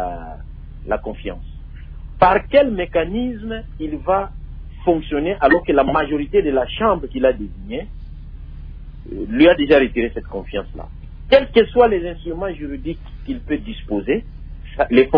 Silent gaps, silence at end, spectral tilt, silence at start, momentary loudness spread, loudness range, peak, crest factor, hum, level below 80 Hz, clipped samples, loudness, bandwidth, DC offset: none; 0 s; -9 dB/octave; 0 s; 23 LU; 4 LU; 0 dBFS; 18 dB; none; -34 dBFS; under 0.1%; -18 LUFS; 5.2 kHz; under 0.1%